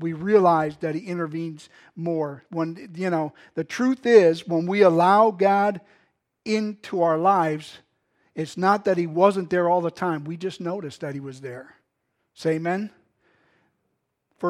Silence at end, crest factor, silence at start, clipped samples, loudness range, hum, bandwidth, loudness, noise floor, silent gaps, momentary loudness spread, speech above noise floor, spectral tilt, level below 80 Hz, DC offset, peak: 0 s; 20 dB; 0 s; under 0.1%; 11 LU; none; 12 kHz; -22 LUFS; -76 dBFS; none; 16 LU; 53 dB; -6.5 dB/octave; -70 dBFS; under 0.1%; -2 dBFS